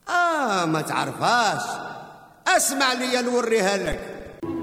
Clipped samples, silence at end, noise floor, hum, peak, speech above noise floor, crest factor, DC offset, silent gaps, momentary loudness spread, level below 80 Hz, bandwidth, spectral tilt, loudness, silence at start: under 0.1%; 0 s; -43 dBFS; none; -6 dBFS; 20 dB; 18 dB; under 0.1%; none; 13 LU; -50 dBFS; 16 kHz; -3 dB/octave; -22 LUFS; 0.05 s